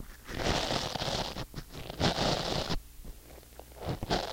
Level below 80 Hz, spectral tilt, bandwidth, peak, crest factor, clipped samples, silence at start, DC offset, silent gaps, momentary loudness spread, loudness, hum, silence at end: -44 dBFS; -4 dB/octave; 16.5 kHz; -12 dBFS; 22 dB; under 0.1%; 0 s; under 0.1%; none; 21 LU; -33 LUFS; none; 0 s